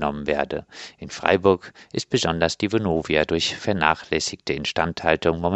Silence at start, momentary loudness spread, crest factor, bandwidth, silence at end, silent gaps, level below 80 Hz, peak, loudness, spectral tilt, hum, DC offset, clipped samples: 0 s; 11 LU; 22 dB; 8.4 kHz; 0 s; none; -46 dBFS; 0 dBFS; -23 LUFS; -4.5 dB/octave; none; under 0.1%; under 0.1%